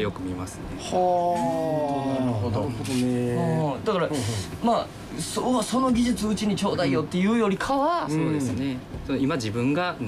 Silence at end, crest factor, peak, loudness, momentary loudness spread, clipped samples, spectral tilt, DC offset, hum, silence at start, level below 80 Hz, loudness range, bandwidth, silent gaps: 0 s; 12 dB; -12 dBFS; -25 LUFS; 8 LU; under 0.1%; -6 dB/octave; under 0.1%; none; 0 s; -48 dBFS; 2 LU; 15 kHz; none